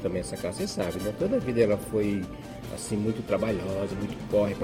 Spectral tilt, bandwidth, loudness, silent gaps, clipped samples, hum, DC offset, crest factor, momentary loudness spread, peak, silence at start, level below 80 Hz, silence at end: -6 dB/octave; 17 kHz; -29 LUFS; none; under 0.1%; none; under 0.1%; 18 dB; 9 LU; -10 dBFS; 0 s; -48 dBFS; 0 s